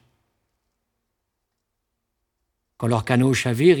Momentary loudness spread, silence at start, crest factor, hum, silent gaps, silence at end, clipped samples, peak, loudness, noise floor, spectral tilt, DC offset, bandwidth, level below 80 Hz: 7 LU; 2.8 s; 20 dB; none; none; 0 s; under 0.1%; -4 dBFS; -20 LUFS; -78 dBFS; -6 dB/octave; under 0.1%; 18 kHz; -58 dBFS